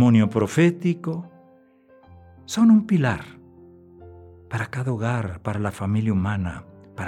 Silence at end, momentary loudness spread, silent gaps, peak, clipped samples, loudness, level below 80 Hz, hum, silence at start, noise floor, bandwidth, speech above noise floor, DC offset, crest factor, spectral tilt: 0 s; 15 LU; none; -6 dBFS; under 0.1%; -22 LUFS; -56 dBFS; none; 0 s; -54 dBFS; 12.5 kHz; 33 dB; under 0.1%; 16 dB; -7 dB/octave